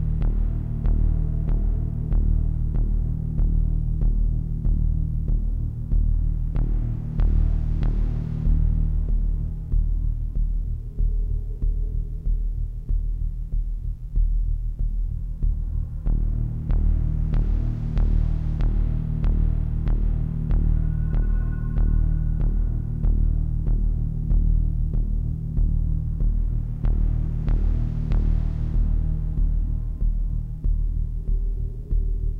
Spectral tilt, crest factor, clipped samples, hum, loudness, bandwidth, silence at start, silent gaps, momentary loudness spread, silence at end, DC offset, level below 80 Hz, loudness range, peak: -11 dB/octave; 12 dB; under 0.1%; none; -26 LUFS; 2 kHz; 0 s; none; 6 LU; 0 s; under 0.1%; -22 dBFS; 4 LU; -10 dBFS